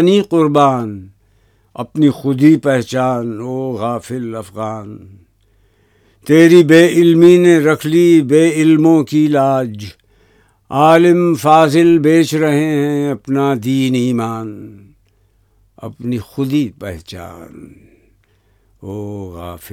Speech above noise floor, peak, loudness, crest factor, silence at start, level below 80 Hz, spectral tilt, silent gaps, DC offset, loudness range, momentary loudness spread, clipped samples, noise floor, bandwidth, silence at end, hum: 43 dB; 0 dBFS; -12 LUFS; 14 dB; 0 s; -52 dBFS; -6.5 dB/octave; none; under 0.1%; 14 LU; 21 LU; 0.2%; -56 dBFS; 15 kHz; 0.05 s; none